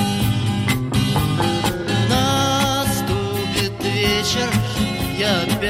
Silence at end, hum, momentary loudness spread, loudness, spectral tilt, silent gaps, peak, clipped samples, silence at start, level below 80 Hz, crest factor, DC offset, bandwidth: 0 s; none; 4 LU; -19 LUFS; -4.5 dB/octave; none; -4 dBFS; under 0.1%; 0 s; -36 dBFS; 16 dB; under 0.1%; 16 kHz